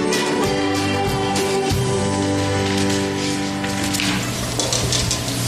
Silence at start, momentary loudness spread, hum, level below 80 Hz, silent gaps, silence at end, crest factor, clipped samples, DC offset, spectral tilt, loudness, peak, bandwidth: 0 s; 3 LU; none; -38 dBFS; none; 0 s; 16 dB; under 0.1%; under 0.1%; -4 dB/octave; -20 LUFS; -4 dBFS; 15.5 kHz